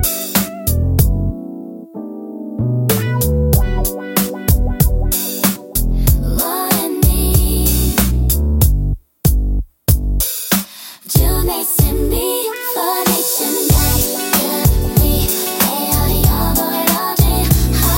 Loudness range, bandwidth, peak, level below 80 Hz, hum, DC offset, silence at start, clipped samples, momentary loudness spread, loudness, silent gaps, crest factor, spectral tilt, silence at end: 3 LU; 17 kHz; 0 dBFS; -20 dBFS; none; under 0.1%; 0 s; under 0.1%; 6 LU; -15 LUFS; none; 14 dB; -4.5 dB/octave; 0 s